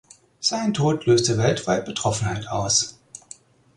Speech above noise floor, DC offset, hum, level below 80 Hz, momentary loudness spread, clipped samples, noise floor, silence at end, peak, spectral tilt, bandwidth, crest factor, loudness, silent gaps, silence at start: 26 dB; under 0.1%; none; -50 dBFS; 8 LU; under 0.1%; -48 dBFS; 0.6 s; -6 dBFS; -4 dB/octave; 11.5 kHz; 18 dB; -22 LUFS; none; 0.4 s